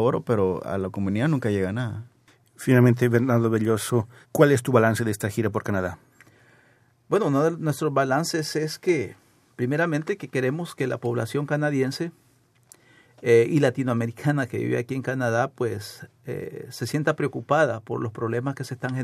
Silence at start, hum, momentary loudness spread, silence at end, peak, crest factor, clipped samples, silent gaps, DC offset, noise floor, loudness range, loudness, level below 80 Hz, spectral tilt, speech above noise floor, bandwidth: 0 s; none; 12 LU; 0 s; -2 dBFS; 22 dB; under 0.1%; none; under 0.1%; -60 dBFS; 6 LU; -24 LUFS; -68 dBFS; -6.5 dB/octave; 37 dB; 15.5 kHz